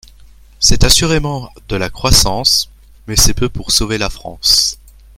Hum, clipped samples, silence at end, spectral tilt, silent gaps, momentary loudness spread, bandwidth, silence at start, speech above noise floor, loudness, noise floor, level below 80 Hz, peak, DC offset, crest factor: none; 0.2%; 0.45 s; -2.5 dB/octave; none; 12 LU; 17 kHz; 0.6 s; 28 dB; -12 LUFS; -41 dBFS; -22 dBFS; 0 dBFS; under 0.1%; 14 dB